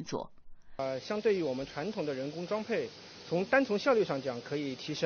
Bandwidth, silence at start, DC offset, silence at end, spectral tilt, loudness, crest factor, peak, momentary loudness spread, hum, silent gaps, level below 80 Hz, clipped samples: 6.6 kHz; 0 s; under 0.1%; 0 s; -4 dB/octave; -33 LUFS; 20 dB; -14 dBFS; 12 LU; none; none; -62 dBFS; under 0.1%